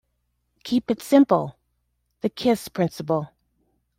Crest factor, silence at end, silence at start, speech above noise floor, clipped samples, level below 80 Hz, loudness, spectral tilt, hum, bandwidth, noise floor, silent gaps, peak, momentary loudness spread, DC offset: 20 dB; 0.7 s; 0.65 s; 52 dB; under 0.1%; -62 dBFS; -23 LUFS; -6.5 dB/octave; 60 Hz at -45 dBFS; 16 kHz; -73 dBFS; none; -4 dBFS; 15 LU; under 0.1%